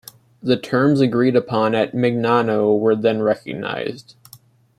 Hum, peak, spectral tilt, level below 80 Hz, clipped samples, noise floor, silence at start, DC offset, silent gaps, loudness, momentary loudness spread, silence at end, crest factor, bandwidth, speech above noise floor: none; -2 dBFS; -7 dB/octave; -62 dBFS; under 0.1%; -49 dBFS; 0.45 s; under 0.1%; none; -18 LUFS; 10 LU; 0.8 s; 16 dB; 15 kHz; 31 dB